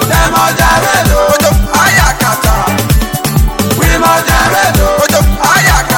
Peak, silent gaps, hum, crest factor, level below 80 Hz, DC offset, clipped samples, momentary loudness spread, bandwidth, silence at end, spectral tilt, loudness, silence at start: 0 dBFS; none; none; 8 dB; -16 dBFS; under 0.1%; 0.1%; 4 LU; 17.5 kHz; 0 s; -4 dB/octave; -9 LUFS; 0 s